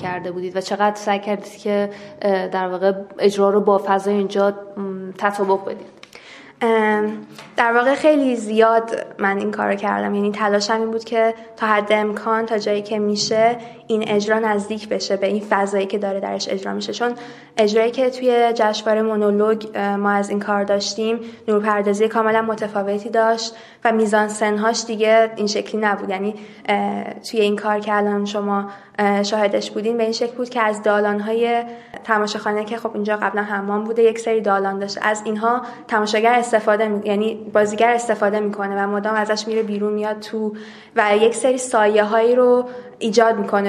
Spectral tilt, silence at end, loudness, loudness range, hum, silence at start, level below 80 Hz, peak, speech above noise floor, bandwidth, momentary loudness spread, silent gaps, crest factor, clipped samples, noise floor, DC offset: -4.5 dB/octave; 0 s; -19 LUFS; 3 LU; none; 0 s; -68 dBFS; 0 dBFS; 23 dB; 12.5 kHz; 9 LU; none; 18 dB; under 0.1%; -42 dBFS; under 0.1%